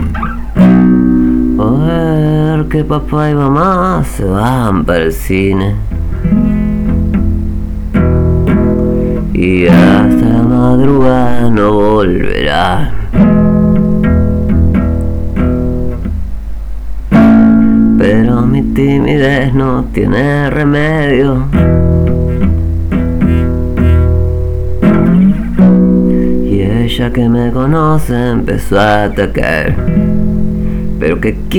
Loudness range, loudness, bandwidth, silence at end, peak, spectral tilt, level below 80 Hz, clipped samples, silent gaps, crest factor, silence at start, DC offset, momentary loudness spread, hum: 4 LU; -10 LUFS; 17.5 kHz; 0 s; 0 dBFS; -8 dB/octave; -18 dBFS; under 0.1%; none; 8 dB; 0 s; under 0.1%; 8 LU; none